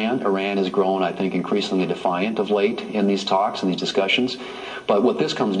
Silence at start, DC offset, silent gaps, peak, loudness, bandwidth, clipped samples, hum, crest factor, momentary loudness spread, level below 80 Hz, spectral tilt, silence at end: 0 s; under 0.1%; none; -6 dBFS; -21 LUFS; 10.5 kHz; under 0.1%; none; 16 dB; 4 LU; -64 dBFS; -5.5 dB/octave; 0 s